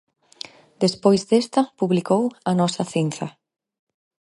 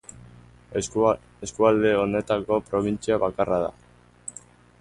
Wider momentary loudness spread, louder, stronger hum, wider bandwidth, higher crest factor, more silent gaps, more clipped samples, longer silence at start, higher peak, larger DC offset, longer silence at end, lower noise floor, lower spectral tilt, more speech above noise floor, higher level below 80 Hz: about the same, 19 LU vs 18 LU; first, -21 LUFS vs -24 LUFS; second, none vs 60 Hz at -45 dBFS; about the same, 11.5 kHz vs 11.5 kHz; about the same, 20 dB vs 20 dB; neither; neither; about the same, 0.8 s vs 0.7 s; first, -2 dBFS vs -6 dBFS; neither; first, 1.1 s vs 0.5 s; second, -42 dBFS vs -49 dBFS; about the same, -6 dB/octave vs -5.5 dB/octave; second, 22 dB vs 26 dB; second, -66 dBFS vs -52 dBFS